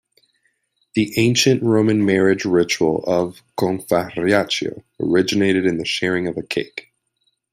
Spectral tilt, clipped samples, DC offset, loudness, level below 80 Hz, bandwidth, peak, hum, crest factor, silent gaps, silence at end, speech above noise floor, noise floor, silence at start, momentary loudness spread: -5 dB/octave; under 0.1%; under 0.1%; -19 LUFS; -56 dBFS; 16 kHz; -2 dBFS; none; 16 dB; none; 0.7 s; 51 dB; -69 dBFS; 0.95 s; 9 LU